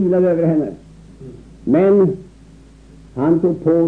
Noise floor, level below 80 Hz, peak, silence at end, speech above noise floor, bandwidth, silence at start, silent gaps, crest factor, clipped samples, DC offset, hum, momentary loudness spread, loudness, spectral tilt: -43 dBFS; -46 dBFS; -4 dBFS; 0 s; 28 dB; 4.3 kHz; 0 s; none; 14 dB; under 0.1%; 0.1%; none; 22 LU; -16 LUFS; -10.5 dB/octave